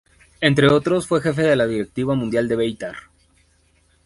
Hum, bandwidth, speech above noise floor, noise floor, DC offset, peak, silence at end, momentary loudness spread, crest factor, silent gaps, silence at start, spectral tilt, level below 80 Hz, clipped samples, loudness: none; 11.5 kHz; 41 dB; -59 dBFS; under 0.1%; 0 dBFS; 1.05 s; 11 LU; 20 dB; none; 0.4 s; -6 dB/octave; -50 dBFS; under 0.1%; -19 LUFS